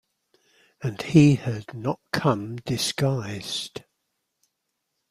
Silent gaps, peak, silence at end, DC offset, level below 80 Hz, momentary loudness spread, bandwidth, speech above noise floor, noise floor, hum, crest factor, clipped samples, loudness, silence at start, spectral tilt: none; -4 dBFS; 1.3 s; under 0.1%; -56 dBFS; 15 LU; 14.5 kHz; 55 dB; -79 dBFS; none; 22 dB; under 0.1%; -24 LUFS; 0.8 s; -6 dB/octave